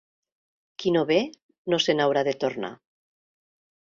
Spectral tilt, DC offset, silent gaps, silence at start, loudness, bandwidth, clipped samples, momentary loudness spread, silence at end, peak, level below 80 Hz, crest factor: -4.5 dB/octave; under 0.1%; 1.42-1.49 s, 1.58-1.65 s; 0.8 s; -25 LUFS; 7.6 kHz; under 0.1%; 15 LU; 1.05 s; -8 dBFS; -68 dBFS; 20 dB